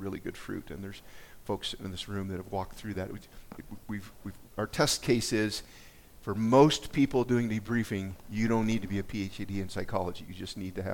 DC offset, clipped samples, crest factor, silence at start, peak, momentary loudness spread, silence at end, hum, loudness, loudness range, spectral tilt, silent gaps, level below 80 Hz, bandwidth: under 0.1%; under 0.1%; 22 dB; 0 s; -8 dBFS; 18 LU; 0 s; none; -31 LUFS; 11 LU; -5 dB/octave; none; -52 dBFS; 18 kHz